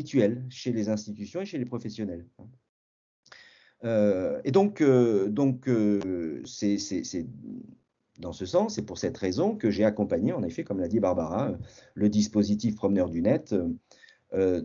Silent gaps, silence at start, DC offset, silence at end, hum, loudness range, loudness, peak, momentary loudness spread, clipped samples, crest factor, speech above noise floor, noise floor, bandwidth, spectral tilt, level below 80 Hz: 2.69-3.23 s; 0 s; under 0.1%; 0 s; none; 7 LU; -27 LUFS; -10 dBFS; 12 LU; under 0.1%; 18 dB; 28 dB; -54 dBFS; 7.6 kHz; -6.5 dB/octave; -60 dBFS